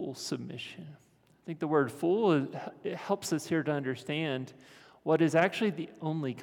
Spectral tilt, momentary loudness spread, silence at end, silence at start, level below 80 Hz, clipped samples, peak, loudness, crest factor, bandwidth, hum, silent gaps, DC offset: -5.5 dB/octave; 16 LU; 0 s; 0 s; -80 dBFS; under 0.1%; -10 dBFS; -31 LUFS; 20 dB; 17.5 kHz; none; none; under 0.1%